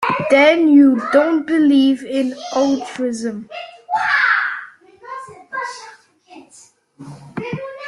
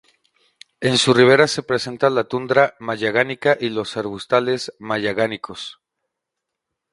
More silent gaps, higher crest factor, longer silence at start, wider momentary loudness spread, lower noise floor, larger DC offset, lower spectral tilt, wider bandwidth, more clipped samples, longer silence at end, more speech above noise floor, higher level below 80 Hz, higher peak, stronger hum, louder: neither; about the same, 16 dB vs 20 dB; second, 0 s vs 0.8 s; first, 21 LU vs 13 LU; second, -48 dBFS vs -81 dBFS; neither; about the same, -5 dB/octave vs -4.5 dB/octave; about the same, 11 kHz vs 11.5 kHz; neither; second, 0 s vs 1.2 s; second, 34 dB vs 63 dB; about the same, -64 dBFS vs -60 dBFS; about the same, -2 dBFS vs 0 dBFS; neither; first, -16 LUFS vs -19 LUFS